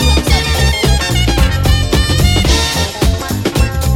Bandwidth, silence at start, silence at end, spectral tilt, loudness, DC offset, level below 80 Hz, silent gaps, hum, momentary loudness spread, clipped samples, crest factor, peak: 16.5 kHz; 0 s; 0 s; -4.5 dB/octave; -13 LUFS; under 0.1%; -16 dBFS; none; none; 4 LU; under 0.1%; 12 dB; 0 dBFS